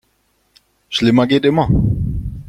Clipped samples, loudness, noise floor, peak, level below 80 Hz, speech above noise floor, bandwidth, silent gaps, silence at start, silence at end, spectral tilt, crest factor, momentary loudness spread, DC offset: under 0.1%; -15 LUFS; -62 dBFS; -2 dBFS; -30 dBFS; 49 dB; 12 kHz; none; 0.9 s; 0 s; -7 dB/octave; 14 dB; 9 LU; under 0.1%